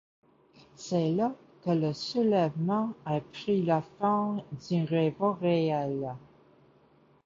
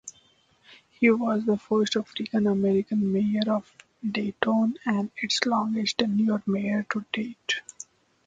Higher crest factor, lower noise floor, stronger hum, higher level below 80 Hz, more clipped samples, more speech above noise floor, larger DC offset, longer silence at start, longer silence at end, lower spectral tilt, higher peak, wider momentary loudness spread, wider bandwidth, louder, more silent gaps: second, 16 dB vs 22 dB; about the same, -62 dBFS vs -62 dBFS; neither; about the same, -70 dBFS vs -66 dBFS; neither; about the same, 34 dB vs 37 dB; neither; first, 0.8 s vs 0.05 s; first, 1.1 s vs 0.65 s; first, -7.5 dB/octave vs -5 dB/octave; second, -14 dBFS vs -4 dBFS; about the same, 8 LU vs 8 LU; second, 7.6 kHz vs 8.6 kHz; second, -29 LUFS vs -26 LUFS; neither